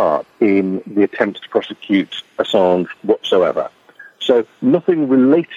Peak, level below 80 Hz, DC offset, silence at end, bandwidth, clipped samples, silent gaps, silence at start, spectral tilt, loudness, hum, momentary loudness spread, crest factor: -2 dBFS; -64 dBFS; under 0.1%; 0 s; 7.6 kHz; under 0.1%; none; 0 s; -6.5 dB/octave; -16 LUFS; none; 8 LU; 14 dB